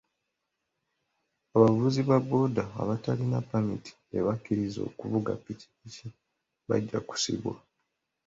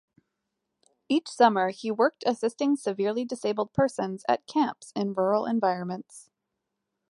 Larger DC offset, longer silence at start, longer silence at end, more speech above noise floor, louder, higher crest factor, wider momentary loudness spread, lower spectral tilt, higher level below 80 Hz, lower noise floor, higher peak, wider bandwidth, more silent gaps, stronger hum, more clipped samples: neither; first, 1.55 s vs 1.1 s; second, 0.7 s vs 0.9 s; about the same, 54 dB vs 57 dB; about the same, -29 LUFS vs -27 LUFS; about the same, 24 dB vs 22 dB; first, 21 LU vs 9 LU; about the same, -6.5 dB/octave vs -5.5 dB/octave; first, -62 dBFS vs -68 dBFS; about the same, -83 dBFS vs -83 dBFS; about the same, -6 dBFS vs -6 dBFS; second, 7.8 kHz vs 11.5 kHz; neither; neither; neither